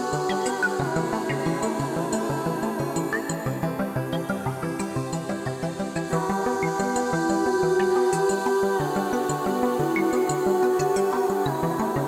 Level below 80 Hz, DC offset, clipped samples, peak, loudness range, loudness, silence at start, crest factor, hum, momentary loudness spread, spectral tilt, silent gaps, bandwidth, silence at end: -54 dBFS; under 0.1%; under 0.1%; -12 dBFS; 5 LU; -25 LUFS; 0 s; 14 dB; none; 7 LU; -5.5 dB/octave; none; 16.5 kHz; 0 s